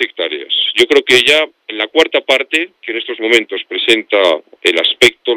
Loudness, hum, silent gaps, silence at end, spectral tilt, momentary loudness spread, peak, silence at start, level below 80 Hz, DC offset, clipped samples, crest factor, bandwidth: -12 LUFS; none; none; 0 s; -1.5 dB/octave; 12 LU; 0 dBFS; 0 s; -56 dBFS; under 0.1%; 0.2%; 14 dB; 16.5 kHz